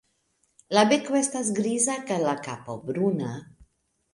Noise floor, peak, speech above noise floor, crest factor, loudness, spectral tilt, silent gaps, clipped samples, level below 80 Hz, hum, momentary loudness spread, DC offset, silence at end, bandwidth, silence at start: -71 dBFS; -6 dBFS; 46 dB; 20 dB; -25 LUFS; -4 dB/octave; none; under 0.1%; -66 dBFS; none; 14 LU; under 0.1%; 0.7 s; 11.5 kHz; 0.7 s